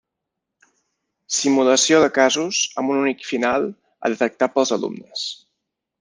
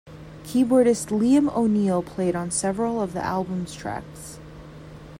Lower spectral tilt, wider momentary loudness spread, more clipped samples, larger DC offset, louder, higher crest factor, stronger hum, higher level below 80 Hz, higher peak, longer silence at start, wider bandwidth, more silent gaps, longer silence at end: second, -2.5 dB/octave vs -6 dB/octave; second, 13 LU vs 23 LU; neither; neither; first, -19 LUFS vs -23 LUFS; about the same, 18 dB vs 16 dB; neither; second, -66 dBFS vs -52 dBFS; first, -2 dBFS vs -8 dBFS; first, 1.3 s vs 0.05 s; second, 10 kHz vs 16 kHz; neither; first, 0.65 s vs 0 s